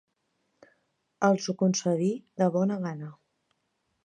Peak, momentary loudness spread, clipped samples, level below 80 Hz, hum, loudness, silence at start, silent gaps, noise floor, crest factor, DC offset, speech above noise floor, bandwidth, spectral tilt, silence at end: -8 dBFS; 10 LU; under 0.1%; -78 dBFS; none; -27 LUFS; 1.2 s; none; -77 dBFS; 22 dB; under 0.1%; 50 dB; 9.6 kHz; -6 dB/octave; 0.9 s